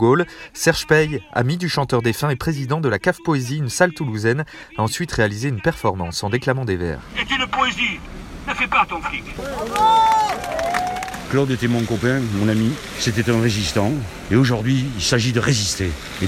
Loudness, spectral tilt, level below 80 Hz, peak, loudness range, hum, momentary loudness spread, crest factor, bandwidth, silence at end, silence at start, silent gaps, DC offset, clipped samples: -20 LUFS; -5 dB/octave; -42 dBFS; 0 dBFS; 2 LU; none; 8 LU; 20 dB; 16 kHz; 0 s; 0 s; none; under 0.1%; under 0.1%